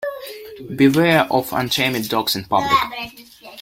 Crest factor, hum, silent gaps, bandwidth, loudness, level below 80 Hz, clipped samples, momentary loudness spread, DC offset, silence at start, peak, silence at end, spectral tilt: 18 dB; none; none; 16.5 kHz; -18 LUFS; -52 dBFS; under 0.1%; 18 LU; under 0.1%; 0 s; -2 dBFS; 0 s; -4.5 dB/octave